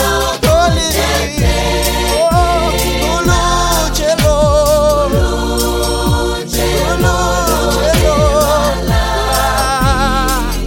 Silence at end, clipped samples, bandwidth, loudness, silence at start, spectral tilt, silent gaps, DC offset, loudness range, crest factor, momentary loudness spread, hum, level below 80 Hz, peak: 0 s; under 0.1%; 17 kHz; -13 LUFS; 0 s; -4 dB/octave; none; under 0.1%; 1 LU; 12 dB; 4 LU; none; -18 dBFS; 0 dBFS